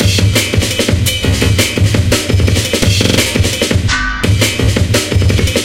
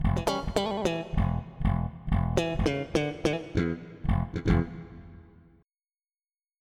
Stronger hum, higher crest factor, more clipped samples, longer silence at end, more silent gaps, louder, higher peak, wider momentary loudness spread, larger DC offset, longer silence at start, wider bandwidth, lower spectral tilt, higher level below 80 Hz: neither; second, 12 dB vs 18 dB; neither; second, 0 s vs 1.4 s; neither; first, -12 LUFS vs -29 LUFS; first, 0 dBFS vs -12 dBFS; second, 2 LU vs 6 LU; neither; about the same, 0 s vs 0 s; first, 16.5 kHz vs 13.5 kHz; second, -4 dB/octave vs -6.5 dB/octave; first, -22 dBFS vs -36 dBFS